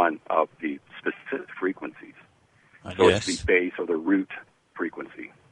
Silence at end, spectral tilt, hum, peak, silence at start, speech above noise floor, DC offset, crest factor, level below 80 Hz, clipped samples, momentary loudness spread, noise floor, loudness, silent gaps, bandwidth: 0.25 s; -4.5 dB/octave; none; -4 dBFS; 0 s; 36 dB; under 0.1%; 22 dB; -52 dBFS; under 0.1%; 19 LU; -60 dBFS; -26 LUFS; none; 11 kHz